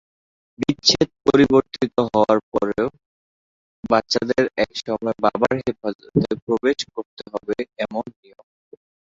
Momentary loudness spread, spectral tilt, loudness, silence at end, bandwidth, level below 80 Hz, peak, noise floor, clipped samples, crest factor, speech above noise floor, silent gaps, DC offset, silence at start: 12 LU; -5 dB/octave; -21 LUFS; 1.1 s; 7.6 kHz; -52 dBFS; 0 dBFS; under -90 dBFS; under 0.1%; 22 dB; over 69 dB; 2.43-2.52 s, 3.06-3.83 s, 5.95-5.99 s, 6.42-6.47 s, 7.06-7.17 s; under 0.1%; 0.6 s